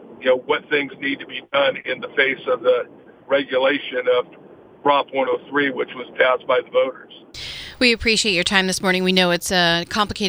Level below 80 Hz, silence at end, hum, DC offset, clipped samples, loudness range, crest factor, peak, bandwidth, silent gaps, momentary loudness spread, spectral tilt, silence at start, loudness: -50 dBFS; 0 s; none; under 0.1%; under 0.1%; 3 LU; 20 dB; 0 dBFS; over 20 kHz; none; 11 LU; -3.5 dB/octave; 0 s; -19 LUFS